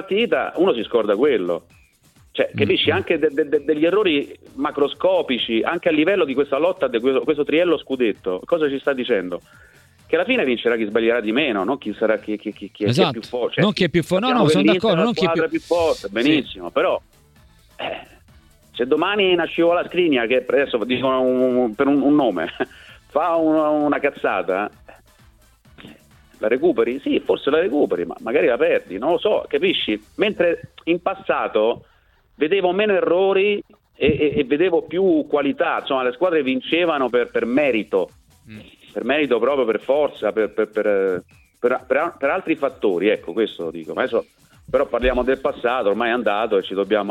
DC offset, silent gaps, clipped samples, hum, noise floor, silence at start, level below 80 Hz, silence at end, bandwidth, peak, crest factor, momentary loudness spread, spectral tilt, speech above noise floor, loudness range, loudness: under 0.1%; none; under 0.1%; none; -54 dBFS; 0 s; -50 dBFS; 0 s; 12.5 kHz; -2 dBFS; 18 dB; 7 LU; -6 dB/octave; 35 dB; 4 LU; -20 LUFS